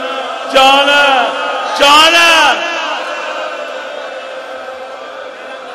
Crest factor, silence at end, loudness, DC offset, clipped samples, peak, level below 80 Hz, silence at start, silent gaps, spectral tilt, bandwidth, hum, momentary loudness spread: 12 dB; 0 s; -9 LUFS; under 0.1%; 0.5%; 0 dBFS; -52 dBFS; 0 s; none; 0 dB/octave; 20 kHz; none; 21 LU